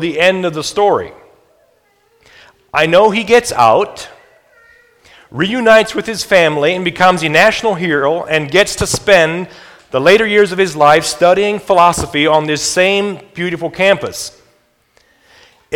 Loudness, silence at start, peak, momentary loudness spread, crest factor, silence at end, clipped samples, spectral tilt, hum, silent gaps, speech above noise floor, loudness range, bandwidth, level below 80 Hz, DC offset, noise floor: -12 LUFS; 0 s; 0 dBFS; 12 LU; 14 dB; 0 s; 0.3%; -3.5 dB/octave; none; none; 43 dB; 4 LU; 18.5 kHz; -44 dBFS; under 0.1%; -55 dBFS